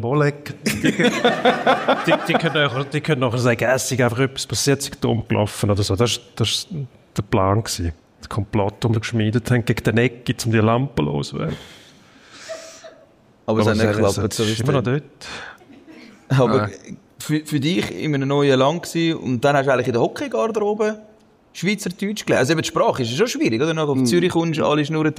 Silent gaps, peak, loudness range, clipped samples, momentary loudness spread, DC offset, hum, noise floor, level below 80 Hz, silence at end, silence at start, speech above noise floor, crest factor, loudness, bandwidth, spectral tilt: none; -4 dBFS; 4 LU; under 0.1%; 12 LU; under 0.1%; none; -52 dBFS; -48 dBFS; 0 s; 0 s; 33 dB; 16 dB; -20 LUFS; 15.5 kHz; -5 dB/octave